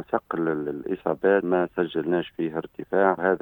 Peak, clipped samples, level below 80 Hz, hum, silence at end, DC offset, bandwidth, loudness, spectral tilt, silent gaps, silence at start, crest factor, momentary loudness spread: -6 dBFS; under 0.1%; -62 dBFS; none; 0.05 s; under 0.1%; 19 kHz; -25 LUFS; -9 dB/octave; none; 0 s; 20 dB; 8 LU